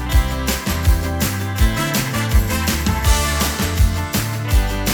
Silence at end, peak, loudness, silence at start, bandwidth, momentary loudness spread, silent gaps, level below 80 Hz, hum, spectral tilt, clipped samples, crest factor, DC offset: 0 s; -2 dBFS; -19 LUFS; 0 s; over 20 kHz; 4 LU; none; -20 dBFS; none; -4 dB/octave; under 0.1%; 14 dB; under 0.1%